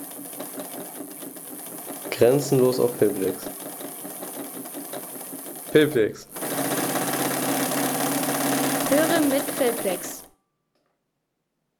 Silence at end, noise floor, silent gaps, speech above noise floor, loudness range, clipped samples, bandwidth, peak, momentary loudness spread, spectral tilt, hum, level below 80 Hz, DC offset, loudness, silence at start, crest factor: 1.5 s; -77 dBFS; none; 56 dB; 4 LU; under 0.1%; over 20 kHz; -6 dBFS; 15 LU; -4 dB/octave; none; -66 dBFS; under 0.1%; -24 LUFS; 0 s; 20 dB